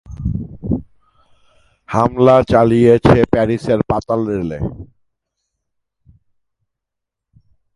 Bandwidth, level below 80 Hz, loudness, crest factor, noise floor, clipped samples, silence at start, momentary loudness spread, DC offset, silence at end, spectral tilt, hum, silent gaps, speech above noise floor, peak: 11.5 kHz; -36 dBFS; -15 LUFS; 18 dB; -81 dBFS; under 0.1%; 0.1 s; 13 LU; under 0.1%; 2.9 s; -8.5 dB/octave; none; none; 67 dB; 0 dBFS